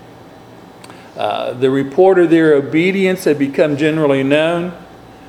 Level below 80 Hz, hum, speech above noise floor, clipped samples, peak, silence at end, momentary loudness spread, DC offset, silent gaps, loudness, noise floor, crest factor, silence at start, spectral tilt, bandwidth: -56 dBFS; none; 25 dB; under 0.1%; 0 dBFS; 0.3 s; 10 LU; under 0.1%; none; -14 LUFS; -38 dBFS; 14 dB; 0.2 s; -6.5 dB/octave; 14.5 kHz